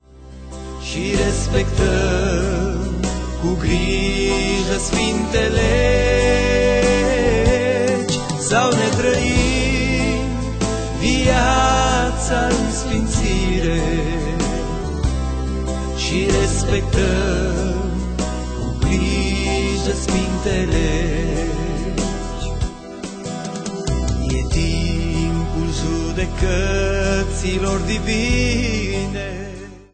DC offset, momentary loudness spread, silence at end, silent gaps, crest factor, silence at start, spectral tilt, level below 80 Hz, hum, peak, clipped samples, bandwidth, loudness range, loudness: under 0.1%; 9 LU; 0.1 s; none; 16 dB; 0.1 s; -5 dB/octave; -24 dBFS; none; -2 dBFS; under 0.1%; 9.2 kHz; 6 LU; -19 LUFS